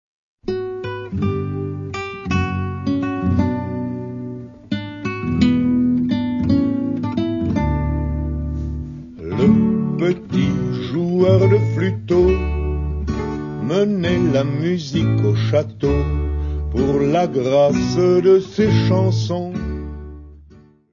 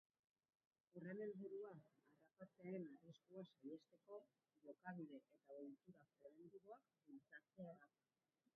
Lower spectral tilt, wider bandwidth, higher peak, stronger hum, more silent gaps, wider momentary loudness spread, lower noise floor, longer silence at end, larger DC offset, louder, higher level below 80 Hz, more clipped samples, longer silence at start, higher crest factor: first, -8 dB/octave vs -5 dB/octave; first, 7.4 kHz vs 3.5 kHz; first, -2 dBFS vs -40 dBFS; neither; neither; about the same, 12 LU vs 14 LU; second, -47 dBFS vs under -90 dBFS; second, 0.4 s vs 0.7 s; neither; first, -19 LUFS vs -60 LUFS; first, -30 dBFS vs under -90 dBFS; neither; second, 0.45 s vs 0.95 s; about the same, 16 dB vs 20 dB